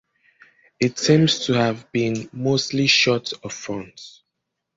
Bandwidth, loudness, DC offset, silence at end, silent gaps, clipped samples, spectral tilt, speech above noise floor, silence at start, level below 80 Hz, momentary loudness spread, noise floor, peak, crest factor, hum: 7.8 kHz; -20 LUFS; under 0.1%; 0.7 s; none; under 0.1%; -4.5 dB/octave; 59 dB; 0.8 s; -58 dBFS; 15 LU; -79 dBFS; -2 dBFS; 20 dB; none